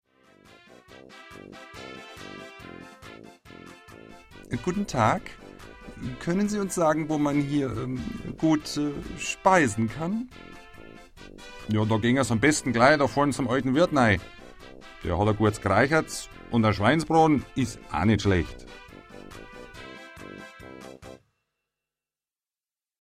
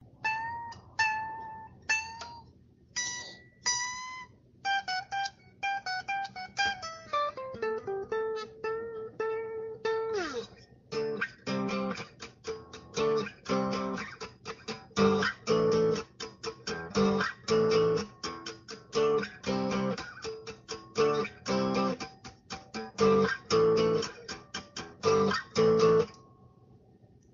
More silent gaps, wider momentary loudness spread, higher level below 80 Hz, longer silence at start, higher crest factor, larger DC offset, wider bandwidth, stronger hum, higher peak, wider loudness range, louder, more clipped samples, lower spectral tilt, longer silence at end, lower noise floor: neither; first, 24 LU vs 16 LU; first, -50 dBFS vs -62 dBFS; first, 1.1 s vs 0.2 s; about the same, 22 dB vs 20 dB; neither; first, 15 kHz vs 7.4 kHz; neither; first, -6 dBFS vs -12 dBFS; first, 20 LU vs 6 LU; first, -25 LUFS vs -31 LUFS; neither; first, -5.5 dB/octave vs -3.5 dB/octave; first, 1.9 s vs 1.2 s; first, under -90 dBFS vs -59 dBFS